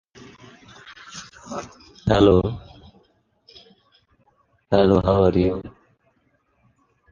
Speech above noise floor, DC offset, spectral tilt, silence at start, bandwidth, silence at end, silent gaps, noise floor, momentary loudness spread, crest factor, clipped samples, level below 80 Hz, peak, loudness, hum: 48 dB; under 0.1%; -7.5 dB/octave; 0.9 s; 7.6 kHz; 1.45 s; none; -66 dBFS; 25 LU; 20 dB; under 0.1%; -40 dBFS; -2 dBFS; -19 LUFS; none